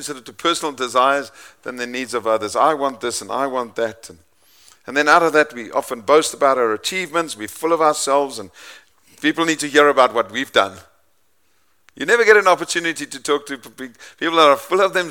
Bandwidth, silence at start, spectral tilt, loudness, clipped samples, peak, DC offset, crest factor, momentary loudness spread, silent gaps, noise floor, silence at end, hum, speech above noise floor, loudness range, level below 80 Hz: 18 kHz; 0 s; -2.5 dB/octave; -18 LUFS; under 0.1%; 0 dBFS; 0.1%; 18 dB; 14 LU; none; -65 dBFS; 0 s; none; 47 dB; 4 LU; -66 dBFS